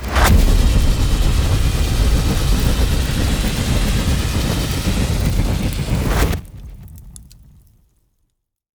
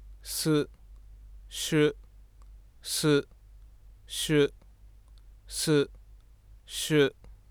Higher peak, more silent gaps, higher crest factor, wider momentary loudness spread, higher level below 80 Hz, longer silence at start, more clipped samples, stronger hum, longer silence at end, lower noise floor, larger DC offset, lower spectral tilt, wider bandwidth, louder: first, -2 dBFS vs -12 dBFS; neither; about the same, 14 dB vs 18 dB; second, 6 LU vs 13 LU; first, -18 dBFS vs -52 dBFS; about the same, 0 s vs 0 s; neither; neither; first, 1.45 s vs 0.15 s; first, -69 dBFS vs -54 dBFS; first, 0.8% vs under 0.1%; about the same, -5 dB/octave vs -4.5 dB/octave; about the same, over 20 kHz vs over 20 kHz; first, -18 LUFS vs -28 LUFS